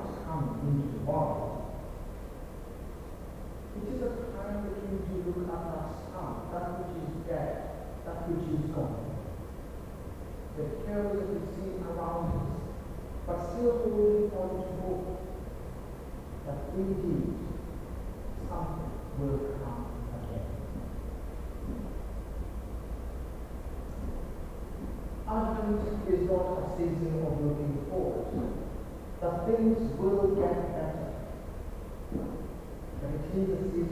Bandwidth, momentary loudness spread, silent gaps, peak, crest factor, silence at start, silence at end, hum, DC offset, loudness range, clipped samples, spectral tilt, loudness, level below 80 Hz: 16 kHz; 14 LU; none; -16 dBFS; 18 dB; 0 s; 0 s; none; under 0.1%; 9 LU; under 0.1%; -8.5 dB/octave; -35 LUFS; -42 dBFS